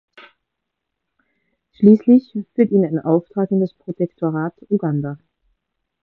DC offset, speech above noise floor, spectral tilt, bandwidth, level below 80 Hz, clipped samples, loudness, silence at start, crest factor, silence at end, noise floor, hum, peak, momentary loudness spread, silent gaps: under 0.1%; 62 dB; -12 dB/octave; 4.4 kHz; -62 dBFS; under 0.1%; -18 LUFS; 1.8 s; 18 dB; 0.9 s; -79 dBFS; none; 0 dBFS; 12 LU; none